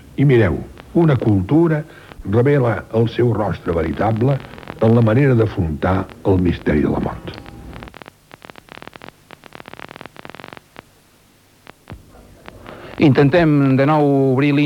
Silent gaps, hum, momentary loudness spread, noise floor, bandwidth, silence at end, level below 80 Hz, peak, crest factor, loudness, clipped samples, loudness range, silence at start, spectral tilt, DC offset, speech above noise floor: none; none; 23 LU; -52 dBFS; 11.5 kHz; 0 s; -40 dBFS; -4 dBFS; 14 dB; -16 LUFS; under 0.1%; 22 LU; 0.2 s; -9 dB/octave; under 0.1%; 37 dB